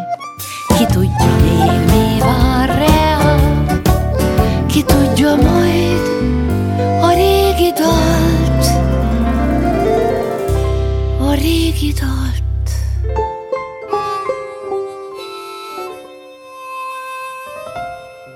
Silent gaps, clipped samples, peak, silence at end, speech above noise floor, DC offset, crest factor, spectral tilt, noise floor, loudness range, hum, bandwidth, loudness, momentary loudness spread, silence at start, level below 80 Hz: none; under 0.1%; 0 dBFS; 0 s; 25 dB; under 0.1%; 14 dB; -6 dB/octave; -36 dBFS; 12 LU; none; 17 kHz; -14 LUFS; 15 LU; 0 s; -20 dBFS